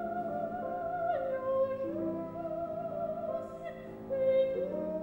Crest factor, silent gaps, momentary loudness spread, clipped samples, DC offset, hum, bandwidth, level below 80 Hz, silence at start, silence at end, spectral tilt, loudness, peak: 14 dB; none; 9 LU; under 0.1%; under 0.1%; none; 16 kHz; -64 dBFS; 0 s; 0 s; -8.5 dB/octave; -34 LUFS; -20 dBFS